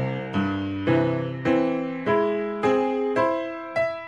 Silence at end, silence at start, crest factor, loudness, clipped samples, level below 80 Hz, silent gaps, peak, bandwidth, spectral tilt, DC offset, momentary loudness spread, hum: 0 s; 0 s; 16 dB; -24 LUFS; under 0.1%; -58 dBFS; none; -8 dBFS; 9.4 kHz; -8 dB/octave; under 0.1%; 4 LU; none